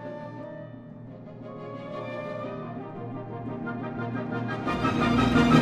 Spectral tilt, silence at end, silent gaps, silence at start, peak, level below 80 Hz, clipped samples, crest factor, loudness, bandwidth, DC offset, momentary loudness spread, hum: -7 dB/octave; 0 s; none; 0 s; -6 dBFS; -48 dBFS; under 0.1%; 22 dB; -29 LUFS; 11.5 kHz; under 0.1%; 19 LU; none